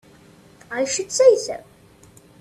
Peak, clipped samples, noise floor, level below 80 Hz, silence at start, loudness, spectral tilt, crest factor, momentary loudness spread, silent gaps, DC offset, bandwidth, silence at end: -2 dBFS; under 0.1%; -50 dBFS; -62 dBFS; 0.7 s; -19 LUFS; -2 dB/octave; 20 dB; 16 LU; none; under 0.1%; 13 kHz; 0.8 s